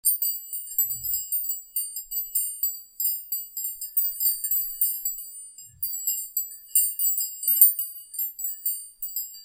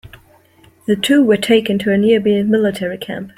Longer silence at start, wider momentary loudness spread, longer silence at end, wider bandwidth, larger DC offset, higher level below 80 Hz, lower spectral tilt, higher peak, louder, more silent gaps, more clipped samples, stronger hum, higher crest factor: about the same, 0.05 s vs 0.05 s; about the same, 10 LU vs 11 LU; about the same, 0 s vs 0.1 s; about the same, 16.5 kHz vs 15.5 kHz; neither; second, -66 dBFS vs -54 dBFS; second, 3.5 dB/octave vs -5.5 dB/octave; about the same, 0 dBFS vs -2 dBFS; second, -24 LUFS vs -14 LUFS; neither; neither; neither; first, 28 dB vs 14 dB